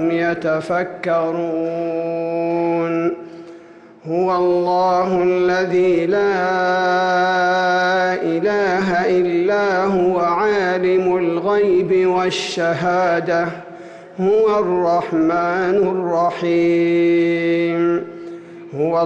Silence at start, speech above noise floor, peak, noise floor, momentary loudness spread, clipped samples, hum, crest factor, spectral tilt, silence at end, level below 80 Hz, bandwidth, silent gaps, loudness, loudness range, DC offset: 0 s; 25 dB; -8 dBFS; -42 dBFS; 6 LU; under 0.1%; none; 8 dB; -6 dB/octave; 0 s; -56 dBFS; 8.4 kHz; none; -17 LUFS; 4 LU; under 0.1%